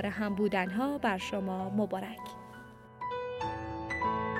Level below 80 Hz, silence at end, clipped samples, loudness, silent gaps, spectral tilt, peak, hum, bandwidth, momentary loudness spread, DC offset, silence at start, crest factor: -60 dBFS; 0 s; under 0.1%; -34 LUFS; none; -6 dB/octave; -16 dBFS; none; 15.5 kHz; 15 LU; under 0.1%; 0 s; 18 dB